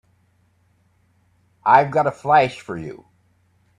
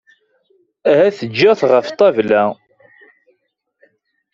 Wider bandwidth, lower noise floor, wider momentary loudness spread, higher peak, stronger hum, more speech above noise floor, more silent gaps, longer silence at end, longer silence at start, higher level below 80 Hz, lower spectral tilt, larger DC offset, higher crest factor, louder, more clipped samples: first, 10.5 kHz vs 7.4 kHz; second, -62 dBFS vs -68 dBFS; first, 17 LU vs 8 LU; about the same, 0 dBFS vs -2 dBFS; neither; second, 44 dB vs 55 dB; neither; second, 0.8 s vs 1.8 s; first, 1.65 s vs 0.85 s; about the same, -62 dBFS vs -62 dBFS; about the same, -6 dB/octave vs -6 dB/octave; neither; first, 22 dB vs 16 dB; second, -18 LUFS vs -14 LUFS; neither